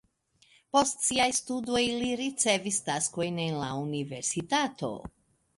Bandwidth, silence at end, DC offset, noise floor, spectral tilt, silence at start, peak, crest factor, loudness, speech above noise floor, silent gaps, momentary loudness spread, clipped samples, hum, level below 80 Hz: 11.5 kHz; 0.5 s; under 0.1%; -66 dBFS; -3 dB/octave; 0.75 s; -10 dBFS; 20 dB; -29 LUFS; 37 dB; none; 8 LU; under 0.1%; none; -62 dBFS